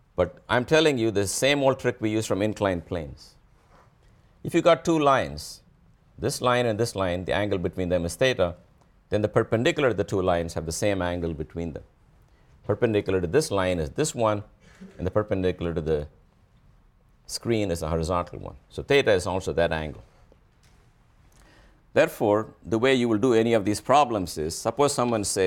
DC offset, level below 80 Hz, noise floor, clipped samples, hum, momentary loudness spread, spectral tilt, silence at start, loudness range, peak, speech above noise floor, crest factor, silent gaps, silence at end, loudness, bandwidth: under 0.1%; -48 dBFS; -59 dBFS; under 0.1%; none; 12 LU; -5 dB/octave; 0.2 s; 6 LU; -6 dBFS; 34 dB; 18 dB; none; 0 s; -25 LUFS; 17.5 kHz